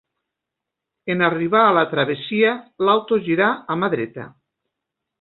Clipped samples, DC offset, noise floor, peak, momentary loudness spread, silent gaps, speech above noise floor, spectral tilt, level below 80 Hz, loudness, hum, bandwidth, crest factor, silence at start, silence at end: under 0.1%; under 0.1%; -83 dBFS; -2 dBFS; 10 LU; none; 65 dB; -10.5 dB/octave; -64 dBFS; -19 LUFS; none; 4.3 kHz; 18 dB; 1.05 s; 0.9 s